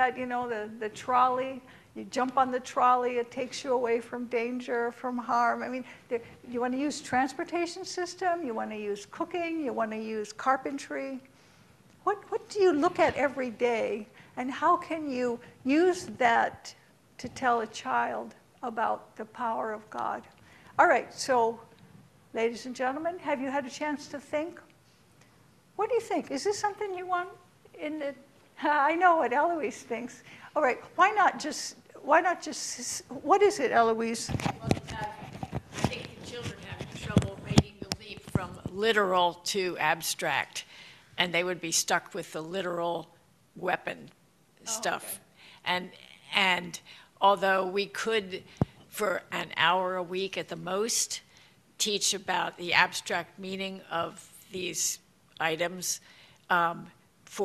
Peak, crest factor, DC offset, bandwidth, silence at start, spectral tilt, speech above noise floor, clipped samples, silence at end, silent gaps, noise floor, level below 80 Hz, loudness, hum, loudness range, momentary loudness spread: -4 dBFS; 26 dB; under 0.1%; 14 kHz; 0 s; -3.5 dB/octave; 32 dB; under 0.1%; 0 s; none; -61 dBFS; -58 dBFS; -29 LUFS; none; 6 LU; 14 LU